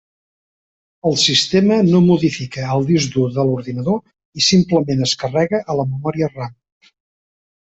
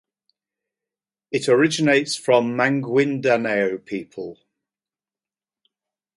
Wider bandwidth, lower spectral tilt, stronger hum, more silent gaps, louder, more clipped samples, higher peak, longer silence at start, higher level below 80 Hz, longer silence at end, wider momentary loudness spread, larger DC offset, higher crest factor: second, 8.2 kHz vs 11.5 kHz; about the same, -5 dB/octave vs -5 dB/octave; neither; first, 4.25-4.32 s vs none; first, -16 LUFS vs -20 LUFS; neither; about the same, -2 dBFS vs -4 dBFS; second, 1.05 s vs 1.3 s; first, -52 dBFS vs -70 dBFS; second, 1.15 s vs 1.85 s; second, 10 LU vs 14 LU; neither; about the same, 16 dB vs 20 dB